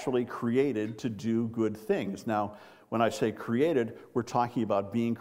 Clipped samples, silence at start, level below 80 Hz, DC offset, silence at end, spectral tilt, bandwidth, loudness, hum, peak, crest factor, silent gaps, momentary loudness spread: under 0.1%; 0 s; -70 dBFS; under 0.1%; 0 s; -6.5 dB/octave; 16 kHz; -30 LUFS; none; -12 dBFS; 18 dB; none; 6 LU